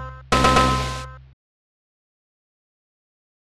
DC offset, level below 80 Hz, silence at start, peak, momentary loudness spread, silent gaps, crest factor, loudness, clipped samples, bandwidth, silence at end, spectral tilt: under 0.1%; -34 dBFS; 0 s; -4 dBFS; 17 LU; none; 22 dB; -19 LUFS; under 0.1%; 14 kHz; 2.25 s; -4.5 dB/octave